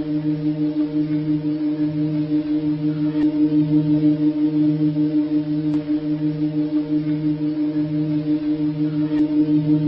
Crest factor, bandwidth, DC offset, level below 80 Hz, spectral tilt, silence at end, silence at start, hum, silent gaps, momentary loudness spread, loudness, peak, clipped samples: 12 dB; 5.6 kHz; under 0.1%; -54 dBFS; -11 dB/octave; 0 s; 0 s; none; none; 4 LU; -20 LUFS; -8 dBFS; under 0.1%